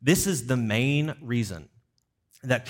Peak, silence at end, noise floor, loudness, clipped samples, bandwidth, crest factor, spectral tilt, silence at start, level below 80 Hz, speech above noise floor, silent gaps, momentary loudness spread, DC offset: -8 dBFS; 0 s; -74 dBFS; -26 LUFS; under 0.1%; 17 kHz; 20 dB; -5 dB/octave; 0 s; -54 dBFS; 49 dB; none; 13 LU; under 0.1%